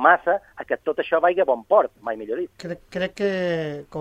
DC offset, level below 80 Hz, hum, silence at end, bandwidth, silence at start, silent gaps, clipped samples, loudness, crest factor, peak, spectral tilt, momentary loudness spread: under 0.1%; -60 dBFS; none; 0 s; 9.8 kHz; 0 s; none; under 0.1%; -23 LUFS; 20 dB; -2 dBFS; -6 dB/octave; 12 LU